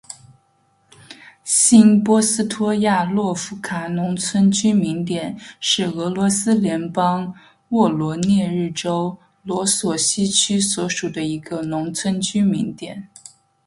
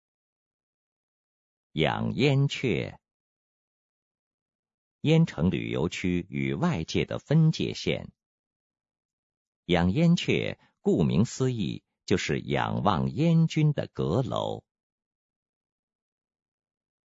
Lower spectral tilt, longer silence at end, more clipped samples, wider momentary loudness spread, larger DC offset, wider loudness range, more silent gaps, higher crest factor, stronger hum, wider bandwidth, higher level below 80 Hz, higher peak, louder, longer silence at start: second, -4 dB/octave vs -6.5 dB/octave; second, 0.6 s vs 2.45 s; neither; first, 12 LU vs 9 LU; neither; about the same, 4 LU vs 4 LU; second, none vs 3.14-4.46 s, 4.55-4.63 s, 4.74-4.99 s, 8.26-8.70 s, 9.05-9.30 s, 9.37-9.63 s; about the same, 20 dB vs 22 dB; neither; first, 11.5 kHz vs 8 kHz; about the same, -58 dBFS vs -56 dBFS; first, 0 dBFS vs -8 dBFS; first, -18 LUFS vs -27 LUFS; second, 0.1 s vs 1.75 s